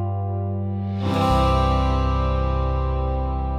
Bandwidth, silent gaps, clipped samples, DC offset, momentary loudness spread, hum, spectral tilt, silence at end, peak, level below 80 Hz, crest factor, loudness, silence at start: 9.8 kHz; none; under 0.1%; under 0.1%; 7 LU; 50 Hz at -50 dBFS; -7.5 dB/octave; 0 s; -8 dBFS; -26 dBFS; 14 dB; -22 LUFS; 0 s